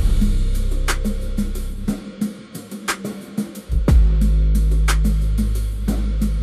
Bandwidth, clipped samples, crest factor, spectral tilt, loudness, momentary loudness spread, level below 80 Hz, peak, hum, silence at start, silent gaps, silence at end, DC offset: 14.5 kHz; under 0.1%; 14 dB; -6 dB/octave; -22 LUFS; 10 LU; -18 dBFS; -4 dBFS; none; 0 s; none; 0 s; under 0.1%